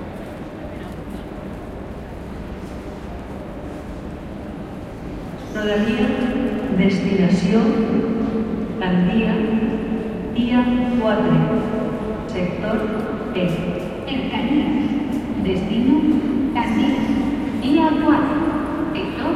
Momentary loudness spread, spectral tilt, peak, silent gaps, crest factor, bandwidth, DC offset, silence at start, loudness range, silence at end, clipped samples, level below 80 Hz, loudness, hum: 15 LU; -7.5 dB/octave; -4 dBFS; none; 16 dB; 12 kHz; under 0.1%; 0 s; 13 LU; 0 s; under 0.1%; -38 dBFS; -20 LUFS; none